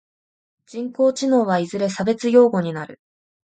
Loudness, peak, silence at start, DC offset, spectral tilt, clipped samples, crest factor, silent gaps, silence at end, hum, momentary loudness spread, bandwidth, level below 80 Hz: -19 LUFS; -2 dBFS; 0.75 s; under 0.1%; -6 dB/octave; under 0.1%; 18 dB; none; 0.5 s; none; 16 LU; 9.2 kHz; -64 dBFS